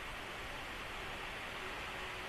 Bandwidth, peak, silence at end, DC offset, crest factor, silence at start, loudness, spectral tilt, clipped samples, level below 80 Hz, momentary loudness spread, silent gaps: 14 kHz; -30 dBFS; 0 s; under 0.1%; 14 dB; 0 s; -43 LUFS; -3 dB/octave; under 0.1%; -56 dBFS; 2 LU; none